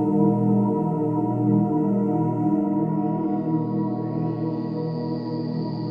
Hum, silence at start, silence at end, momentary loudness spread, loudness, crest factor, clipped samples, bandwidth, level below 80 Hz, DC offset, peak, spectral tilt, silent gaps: 60 Hz at -40 dBFS; 0 s; 0 s; 7 LU; -23 LUFS; 14 dB; under 0.1%; 5.2 kHz; -60 dBFS; under 0.1%; -8 dBFS; -11.5 dB/octave; none